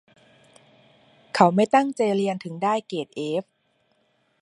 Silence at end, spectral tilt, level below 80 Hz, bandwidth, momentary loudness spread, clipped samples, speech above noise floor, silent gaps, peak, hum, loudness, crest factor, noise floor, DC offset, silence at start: 1 s; -6 dB/octave; -74 dBFS; 11.5 kHz; 12 LU; under 0.1%; 46 dB; none; 0 dBFS; none; -23 LUFS; 24 dB; -68 dBFS; under 0.1%; 1.35 s